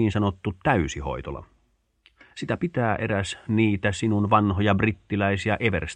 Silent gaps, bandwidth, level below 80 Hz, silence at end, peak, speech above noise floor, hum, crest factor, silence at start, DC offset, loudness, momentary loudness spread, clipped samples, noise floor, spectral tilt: none; 9.8 kHz; -44 dBFS; 0 s; -4 dBFS; 44 dB; none; 20 dB; 0 s; under 0.1%; -24 LUFS; 11 LU; under 0.1%; -68 dBFS; -6.5 dB/octave